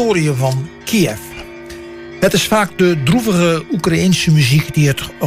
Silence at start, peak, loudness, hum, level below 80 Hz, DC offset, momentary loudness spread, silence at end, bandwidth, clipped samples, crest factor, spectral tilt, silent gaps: 0 s; -2 dBFS; -14 LUFS; none; -40 dBFS; under 0.1%; 19 LU; 0 s; 16 kHz; under 0.1%; 12 dB; -5.5 dB/octave; none